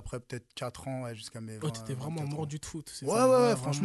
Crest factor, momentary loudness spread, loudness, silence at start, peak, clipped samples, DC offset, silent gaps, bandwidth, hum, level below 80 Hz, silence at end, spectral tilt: 18 dB; 17 LU; -31 LUFS; 0 s; -14 dBFS; under 0.1%; under 0.1%; none; 12.5 kHz; none; -58 dBFS; 0 s; -5.5 dB/octave